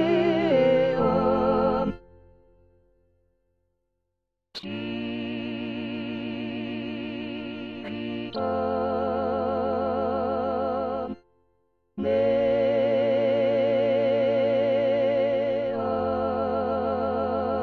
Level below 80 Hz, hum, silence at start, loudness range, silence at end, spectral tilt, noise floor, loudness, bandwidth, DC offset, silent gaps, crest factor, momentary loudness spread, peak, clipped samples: -52 dBFS; none; 0 s; 12 LU; 0 s; -8 dB/octave; -82 dBFS; -25 LUFS; 6.2 kHz; under 0.1%; none; 16 dB; 11 LU; -10 dBFS; under 0.1%